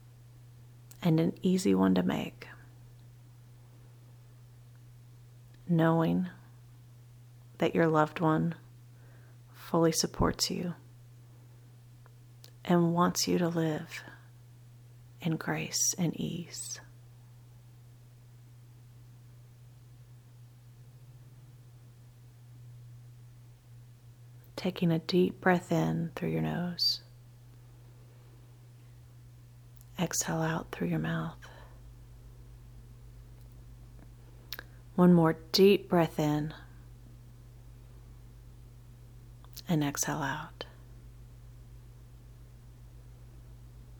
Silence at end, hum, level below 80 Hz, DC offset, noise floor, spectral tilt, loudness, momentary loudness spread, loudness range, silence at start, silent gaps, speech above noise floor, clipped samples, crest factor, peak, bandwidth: 0 s; none; -56 dBFS; under 0.1%; -54 dBFS; -5 dB/octave; -30 LUFS; 27 LU; 22 LU; 1 s; none; 25 dB; under 0.1%; 24 dB; -10 dBFS; 19.5 kHz